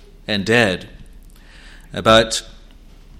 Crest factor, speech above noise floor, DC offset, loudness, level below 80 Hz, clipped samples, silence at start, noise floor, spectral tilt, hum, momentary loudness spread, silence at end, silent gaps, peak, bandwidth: 20 dB; 26 dB; under 0.1%; -17 LUFS; -40 dBFS; under 0.1%; 0.3 s; -43 dBFS; -4 dB/octave; none; 13 LU; 0.7 s; none; 0 dBFS; 15.5 kHz